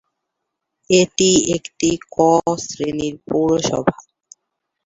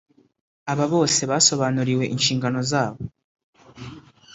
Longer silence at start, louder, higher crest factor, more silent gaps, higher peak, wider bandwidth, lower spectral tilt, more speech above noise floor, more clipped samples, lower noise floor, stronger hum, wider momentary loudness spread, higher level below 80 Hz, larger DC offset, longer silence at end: first, 0.9 s vs 0.65 s; about the same, -18 LUFS vs -20 LUFS; about the same, 18 dB vs 20 dB; second, none vs 3.24-3.35 s, 3.44-3.53 s; about the same, -2 dBFS vs -4 dBFS; about the same, 8.2 kHz vs 8 kHz; about the same, -4 dB/octave vs -3.5 dB/octave; first, 61 dB vs 21 dB; neither; first, -78 dBFS vs -42 dBFS; neither; second, 9 LU vs 23 LU; first, -50 dBFS vs -58 dBFS; neither; first, 0.95 s vs 0.35 s